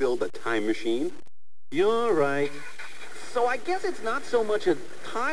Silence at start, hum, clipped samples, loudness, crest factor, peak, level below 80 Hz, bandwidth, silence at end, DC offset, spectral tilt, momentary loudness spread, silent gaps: 0 s; none; under 0.1%; -27 LUFS; 18 dB; -10 dBFS; -62 dBFS; 11 kHz; 0 s; 3%; -4.5 dB/octave; 13 LU; none